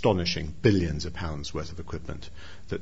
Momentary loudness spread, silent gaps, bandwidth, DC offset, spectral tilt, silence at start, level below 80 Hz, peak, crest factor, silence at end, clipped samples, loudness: 17 LU; none; 8 kHz; 1%; -6 dB/octave; 0 s; -44 dBFS; -8 dBFS; 20 dB; 0 s; under 0.1%; -29 LUFS